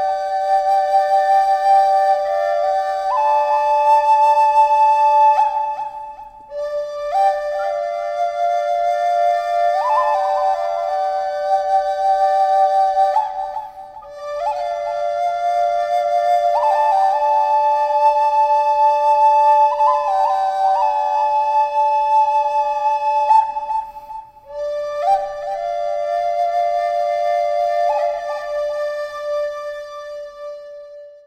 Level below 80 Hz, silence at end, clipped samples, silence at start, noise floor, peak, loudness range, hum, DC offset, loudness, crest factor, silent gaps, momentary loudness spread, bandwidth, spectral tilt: -56 dBFS; 0.1 s; under 0.1%; 0 s; -37 dBFS; -4 dBFS; 6 LU; none; under 0.1%; -17 LUFS; 12 dB; none; 14 LU; 13 kHz; -1 dB/octave